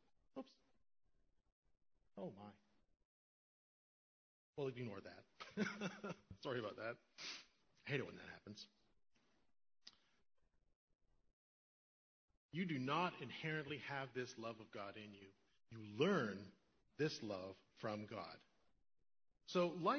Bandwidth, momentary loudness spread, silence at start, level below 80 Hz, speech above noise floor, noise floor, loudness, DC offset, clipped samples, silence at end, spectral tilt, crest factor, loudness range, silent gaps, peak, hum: 6.4 kHz; 21 LU; 0.35 s; -82 dBFS; over 44 dB; under -90 dBFS; -47 LUFS; under 0.1%; under 0.1%; 0 s; -4 dB/octave; 24 dB; 16 LU; 1.52-1.63 s, 3.05-4.53 s, 10.75-10.88 s, 10.95-10.99 s, 11.33-12.28 s, 12.37-12.49 s; -26 dBFS; none